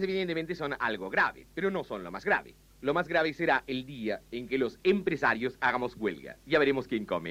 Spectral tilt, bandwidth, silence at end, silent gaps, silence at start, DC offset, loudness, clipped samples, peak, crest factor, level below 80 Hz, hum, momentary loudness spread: -6 dB/octave; 15.5 kHz; 0 s; none; 0 s; under 0.1%; -30 LUFS; under 0.1%; -12 dBFS; 18 dB; -60 dBFS; none; 8 LU